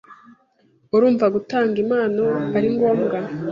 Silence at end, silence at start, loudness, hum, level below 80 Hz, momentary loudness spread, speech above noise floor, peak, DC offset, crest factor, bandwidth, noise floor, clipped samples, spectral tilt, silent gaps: 0 s; 0.1 s; -19 LUFS; none; -62 dBFS; 4 LU; 41 dB; -6 dBFS; under 0.1%; 14 dB; 7.2 kHz; -60 dBFS; under 0.1%; -8.5 dB/octave; none